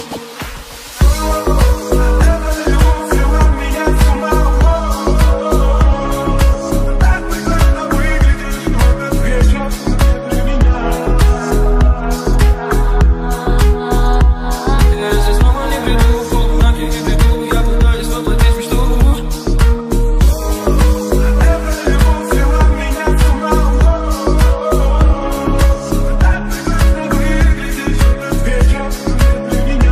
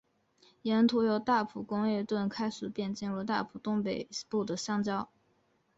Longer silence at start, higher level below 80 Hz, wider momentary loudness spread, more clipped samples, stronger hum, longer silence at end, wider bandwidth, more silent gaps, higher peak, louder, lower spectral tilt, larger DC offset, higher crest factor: second, 0 s vs 0.65 s; first, -12 dBFS vs -70 dBFS; second, 4 LU vs 9 LU; neither; neither; second, 0 s vs 0.75 s; first, 15 kHz vs 8 kHz; neither; first, 0 dBFS vs -16 dBFS; first, -14 LUFS vs -32 LUFS; about the same, -6 dB/octave vs -5.5 dB/octave; neither; second, 10 dB vs 18 dB